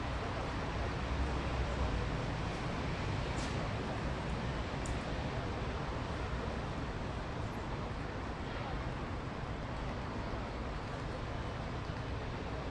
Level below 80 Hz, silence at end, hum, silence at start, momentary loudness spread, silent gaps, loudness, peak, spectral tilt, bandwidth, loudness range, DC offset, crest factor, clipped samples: -44 dBFS; 0 s; none; 0 s; 4 LU; none; -39 LUFS; -24 dBFS; -6 dB/octave; 11 kHz; 3 LU; under 0.1%; 14 dB; under 0.1%